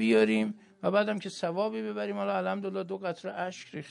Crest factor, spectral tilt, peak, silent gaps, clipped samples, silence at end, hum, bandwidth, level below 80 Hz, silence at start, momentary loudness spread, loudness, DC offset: 18 dB; -6 dB/octave; -12 dBFS; none; under 0.1%; 0 s; none; 11 kHz; -82 dBFS; 0 s; 10 LU; -31 LUFS; under 0.1%